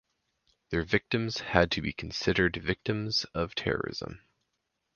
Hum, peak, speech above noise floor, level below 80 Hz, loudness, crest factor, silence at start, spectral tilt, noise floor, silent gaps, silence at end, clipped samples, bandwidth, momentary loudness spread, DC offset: none; -4 dBFS; 51 dB; -48 dBFS; -30 LUFS; 26 dB; 0.7 s; -5 dB/octave; -81 dBFS; none; 0.8 s; under 0.1%; 7.2 kHz; 8 LU; under 0.1%